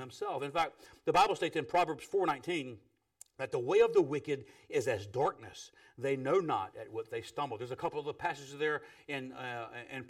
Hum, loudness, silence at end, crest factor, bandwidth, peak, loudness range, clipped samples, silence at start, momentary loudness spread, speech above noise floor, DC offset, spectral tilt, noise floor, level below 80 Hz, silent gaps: none; -34 LUFS; 0 s; 18 dB; 15 kHz; -16 dBFS; 4 LU; under 0.1%; 0 s; 13 LU; 28 dB; under 0.1%; -5 dB/octave; -62 dBFS; -70 dBFS; none